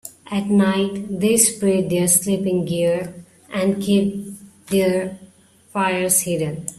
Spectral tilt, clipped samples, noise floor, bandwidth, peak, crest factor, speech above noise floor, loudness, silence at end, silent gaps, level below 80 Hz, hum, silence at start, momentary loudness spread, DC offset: -4.5 dB/octave; under 0.1%; -51 dBFS; 15.5 kHz; 0 dBFS; 20 dB; 32 dB; -19 LUFS; 0.05 s; none; -56 dBFS; none; 0.05 s; 12 LU; under 0.1%